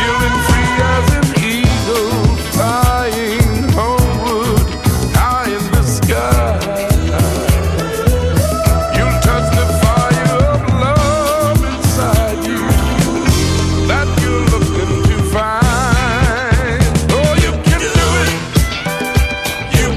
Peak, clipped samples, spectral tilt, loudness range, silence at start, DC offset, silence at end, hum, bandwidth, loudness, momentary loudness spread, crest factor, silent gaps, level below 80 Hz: 0 dBFS; under 0.1%; -5 dB/octave; 1 LU; 0 s; under 0.1%; 0 s; none; 16 kHz; -14 LUFS; 3 LU; 12 dB; none; -18 dBFS